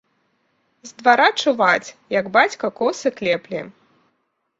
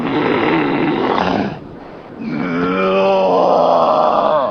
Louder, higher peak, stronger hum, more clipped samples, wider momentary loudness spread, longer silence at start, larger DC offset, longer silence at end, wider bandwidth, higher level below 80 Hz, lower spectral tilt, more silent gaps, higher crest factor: second, -18 LUFS vs -15 LUFS; about the same, -2 dBFS vs 0 dBFS; neither; neither; second, 10 LU vs 16 LU; first, 0.85 s vs 0 s; neither; first, 0.9 s vs 0 s; first, 8 kHz vs 6.6 kHz; second, -68 dBFS vs -48 dBFS; second, -3.5 dB/octave vs -7 dB/octave; neither; first, 20 dB vs 14 dB